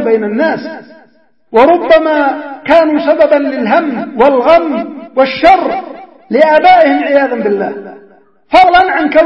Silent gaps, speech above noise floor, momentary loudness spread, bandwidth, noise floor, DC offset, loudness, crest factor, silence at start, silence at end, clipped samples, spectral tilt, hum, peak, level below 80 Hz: none; 41 dB; 13 LU; 7.2 kHz; -49 dBFS; 0.3%; -9 LUFS; 10 dB; 0 s; 0 s; 0.7%; -6 dB/octave; none; 0 dBFS; -44 dBFS